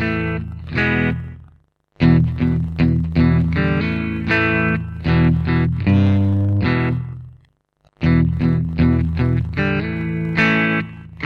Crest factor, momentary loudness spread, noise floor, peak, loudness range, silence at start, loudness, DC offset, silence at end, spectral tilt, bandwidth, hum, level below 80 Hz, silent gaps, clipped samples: 14 dB; 8 LU; -60 dBFS; -4 dBFS; 2 LU; 0 s; -18 LUFS; under 0.1%; 0 s; -9 dB/octave; 6.2 kHz; none; -32 dBFS; none; under 0.1%